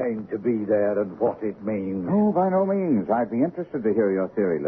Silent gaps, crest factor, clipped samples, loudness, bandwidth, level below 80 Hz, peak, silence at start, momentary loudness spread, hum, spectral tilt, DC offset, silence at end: none; 14 dB; under 0.1%; -24 LUFS; 3 kHz; -62 dBFS; -10 dBFS; 0 s; 6 LU; none; -12 dB/octave; under 0.1%; 0 s